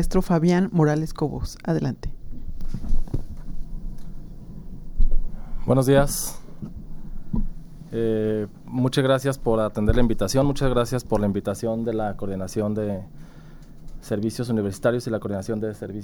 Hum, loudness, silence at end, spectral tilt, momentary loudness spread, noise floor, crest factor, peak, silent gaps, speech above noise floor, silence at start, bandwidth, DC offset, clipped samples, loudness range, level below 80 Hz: none; -24 LUFS; 0 s; -6.5 dB/octave; 20 LU; -42 dBFS; 18 dB; -6 dBFS; none; 20 dB; 0 s; 17 kHz; under 0.1%; under 0.1%; 9 LU; -28 dBFS